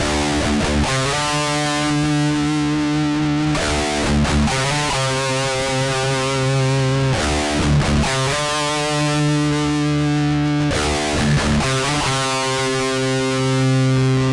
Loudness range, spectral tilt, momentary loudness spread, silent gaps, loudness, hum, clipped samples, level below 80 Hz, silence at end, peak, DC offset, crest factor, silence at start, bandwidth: 0 LU; -4.5 dB/octave; 2 LU; none; -18 LUFS; none; under 0.1%; -32 dBFS; 0 s; -8 dBFS; under 0.1%; 10 dB; 0 s; 11.5 kHz